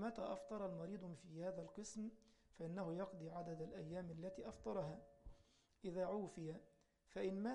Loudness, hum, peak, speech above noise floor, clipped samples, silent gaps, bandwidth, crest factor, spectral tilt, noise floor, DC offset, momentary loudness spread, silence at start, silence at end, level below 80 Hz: -50 LUFS; none; -34 dBFS; 24 dB; under 0.1%; none; 11 kHz; 16 dB; -6.5 dB/octave; -73 dBFS; under 0.1%; 9 LU; 0 s; 0 s; -72 dBFS